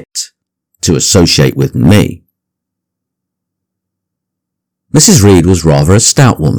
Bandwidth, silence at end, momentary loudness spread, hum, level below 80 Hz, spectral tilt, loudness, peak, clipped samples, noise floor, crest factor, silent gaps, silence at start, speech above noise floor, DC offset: over 20 kHz; 0 s; 12 LU; none; -32 dBFS; -4.5 dB/octave; -7 LUFS; 0 dBFS; 4%; -76 dBFS; 10 dB; none; 0.15 s; 70 dB; under 0.1%